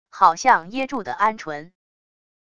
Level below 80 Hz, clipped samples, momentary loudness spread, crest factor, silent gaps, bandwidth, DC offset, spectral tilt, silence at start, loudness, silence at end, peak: -62 dBFS; under 0.1%; 16 LU; 20 dB; none; 9.8 kHz; under 0.1%; -3 dB/octave; 0.15 s; -20 LUFS; 0.8 s; -2 dBFS